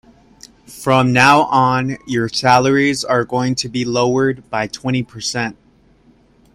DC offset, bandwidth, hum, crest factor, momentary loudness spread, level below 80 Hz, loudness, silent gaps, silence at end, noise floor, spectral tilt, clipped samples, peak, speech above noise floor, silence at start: under 0.1%; 15.5 kHz; none; 16 dB; 11 LU; -50 dBFS; -16 LUFS; none; 1 s; -51 dBFS; -5 dB/octave; under 0.1%; 0 dBFS; 36 dB; 0.7 s